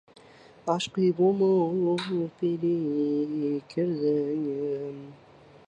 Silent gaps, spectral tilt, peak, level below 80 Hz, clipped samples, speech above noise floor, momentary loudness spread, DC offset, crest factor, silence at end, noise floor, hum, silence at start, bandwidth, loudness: none; -7 dB/octave; -12 dBFS; -72 dBFS; under 0.1%; 26 dB; 8 LU; under 0.1%; 16 dB; 0.55 s; -53 dBFS; none; 0.65 s; 10 kHz; -27 LUFS